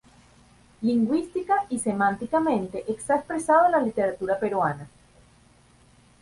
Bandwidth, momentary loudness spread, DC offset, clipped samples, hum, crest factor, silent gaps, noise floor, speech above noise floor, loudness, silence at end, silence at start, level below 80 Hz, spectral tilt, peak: 11.5 kHz; 8 LU; under 0.1%; under 0.1%; none; 18 dB; none; -57 dBFS; 33 dB; -24 LUFS; 1.35 s; 0.8 s; -60 dBFS; -6 dB/octave; -8 dBFS